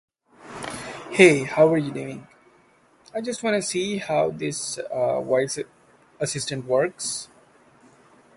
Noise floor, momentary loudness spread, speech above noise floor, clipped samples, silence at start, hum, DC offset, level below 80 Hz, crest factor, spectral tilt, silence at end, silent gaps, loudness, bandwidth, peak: -58 dBFS; 18 LU; 36 dB; under 0.1%; 0.4 s; none; under 0.1%; -64 dBFS; 24 dB; -4 dB/octave; 1.1 s; none; -23 LUFS; 11.5 kHz; 0 dBFS